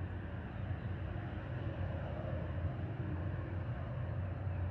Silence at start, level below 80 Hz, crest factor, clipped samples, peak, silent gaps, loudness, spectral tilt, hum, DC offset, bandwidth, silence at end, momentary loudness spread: 0 s; -50 dBFS; 14 dB; under 0.1%; -26 dBFS; none; -41 LUFS; -10 dB/octave; none; under 0.1%; 4.4 kHz; 0 s; 3 LU